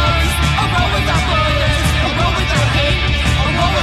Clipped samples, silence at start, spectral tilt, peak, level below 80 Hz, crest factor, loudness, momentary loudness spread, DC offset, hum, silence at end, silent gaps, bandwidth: under 0.1%; 0 s; -4.5 dB/octave; -4 dBFS; -20 dBFS; 10 dB; -14 LUFS; 1 LU; under 0.1%; none; 0 s; none; 14 kHz